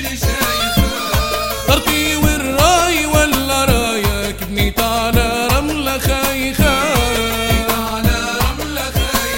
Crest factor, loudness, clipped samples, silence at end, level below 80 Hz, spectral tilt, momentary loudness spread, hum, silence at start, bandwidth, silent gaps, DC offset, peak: 16 dB; -15 LUFS; under 0.1%; 0 s; -24 dBFS; -4 dB/octave; 5 LU; none; 0 s; 16.5 kHz; none; under 0.1%; 0 dBFS